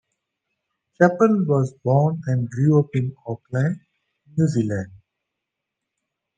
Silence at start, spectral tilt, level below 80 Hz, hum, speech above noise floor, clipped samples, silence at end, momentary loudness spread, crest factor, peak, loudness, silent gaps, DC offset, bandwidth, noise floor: 1 s; -9 dB/octave; -64 dBFS; none; 63 dB; under 0.1%; 1.4 s; 12 LU; 20 dB; -4 dBFS; -21 LUFS; none; under 0.1%; 9.2 kHz; -82 dBFS